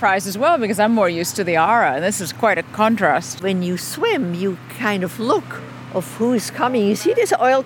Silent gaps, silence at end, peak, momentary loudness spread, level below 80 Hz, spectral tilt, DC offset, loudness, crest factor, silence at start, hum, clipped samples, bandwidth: none; 0 s; -2 dBFS; 8 LU; -64 dBFS; -4.5 dB/octave; under 0.1%; -19 LUFS; 16 dB; 0 s; none; under 0.1%; 18 kHz